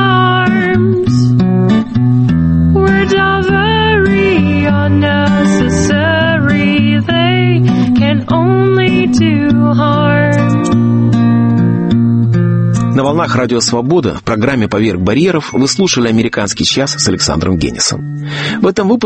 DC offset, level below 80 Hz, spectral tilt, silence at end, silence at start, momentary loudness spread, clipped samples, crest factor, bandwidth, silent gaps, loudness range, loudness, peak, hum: under 0.1%; -32 dBFS; -5.5 dB/octave; 0 s; 0 s; 3 LU; under 0.1%; 10 dB; 8.8 kHz; none; 2 LU; -11 LUFS; 0 dBFS; none